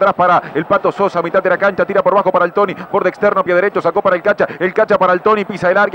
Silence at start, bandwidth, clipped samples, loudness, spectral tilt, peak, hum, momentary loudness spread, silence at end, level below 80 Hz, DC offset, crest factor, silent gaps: 0 s; 15.5 kHz; under 0.1%; -14 LUFS; -7 dB/octave; -2 dBFS; none; 4 LU; 0 s; -54 dBFS; under 0.1%; 12 dB; none